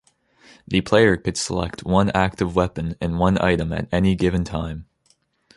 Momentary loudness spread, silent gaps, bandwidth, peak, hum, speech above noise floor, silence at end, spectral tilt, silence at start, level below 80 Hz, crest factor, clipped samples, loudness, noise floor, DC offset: 10 LU; none; 11.5 kHz; -2 dBFS; none; 43 dB; 0.75 s; -6 dB/octave; 0.7 s; -38 dBFS; 18 dB; under 0.1%; -21 LUFS; -63 dBFS; under 0.1%